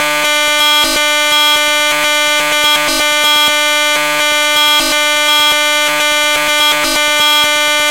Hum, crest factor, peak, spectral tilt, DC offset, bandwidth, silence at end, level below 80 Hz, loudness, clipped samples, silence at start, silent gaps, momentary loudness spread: none; 10 dB; -2 dBFS; 1 dB/octave; 0.9%; 16 kHz; 0 s; -44 dBFS; -9 LUFS; under 0.1%; 0 s; none; 2 LU